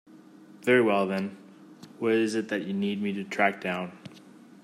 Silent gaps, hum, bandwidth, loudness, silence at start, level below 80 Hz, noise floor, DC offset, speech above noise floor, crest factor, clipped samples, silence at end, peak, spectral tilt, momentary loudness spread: none; none; 13.5 kHz; -27 LUFS; 0.15 s; -78 dBFS; -51 dBFS; under 0.1%; 25 dB; 20 dB; under 0.1%; 0.35 s; -10 dBFS; -6 dB/octave; 14 LU